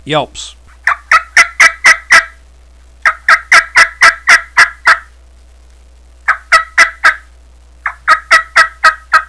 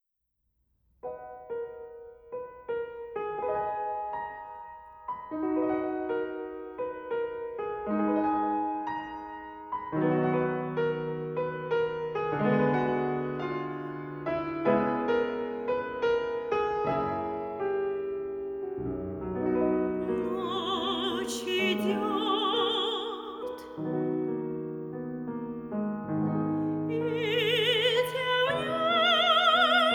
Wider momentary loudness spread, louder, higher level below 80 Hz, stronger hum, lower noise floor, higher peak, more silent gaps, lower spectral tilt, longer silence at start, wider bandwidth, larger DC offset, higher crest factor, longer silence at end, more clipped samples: about the same, 13 LU vs 13 LU; first, -8 LUFS vs -29 LUFS; first, -40 dBFS vs -60 dBFS; neither; second, -40 dBFS vs -79 dBFS; first, 0 dBFS vs -12 dBFS; neither; second, -0.5 dB/octave vs -5.5 dB/octave; second, 0.05 s vs 1.05 s; second, 11 kHz vs 18.5 kHz; first, 0.4% vs under 0.1%; second, 10 dB vs 18 dB; about the same, 0.05 s vs 0 s; first, 2% vs under 0.1%